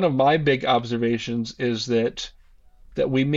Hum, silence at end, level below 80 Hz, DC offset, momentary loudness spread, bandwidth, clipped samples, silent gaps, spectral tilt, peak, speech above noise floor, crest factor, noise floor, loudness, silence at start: none; 0 s; -50 dBFS; under 0.1%; 12 LU; 7.8 kHz; under 0.1%; none; -6 dB/octave; -8 dBFS; 29 dB; 16 dB; -51 dBFS; -23 LUFS; 0 s